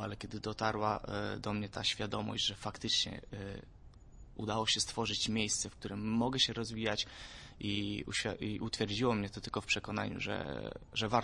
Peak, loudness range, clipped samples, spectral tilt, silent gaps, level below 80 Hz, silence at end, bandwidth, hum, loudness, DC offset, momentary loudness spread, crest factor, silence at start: -14 dBFS; 3 LU; under 0.1%; -3.5 dB/octave; none; -56 dBFS; 0 s; 11.5 kHz; none; -36 LUFS; under 0.1%; 11 LU; 22 dB; 0 s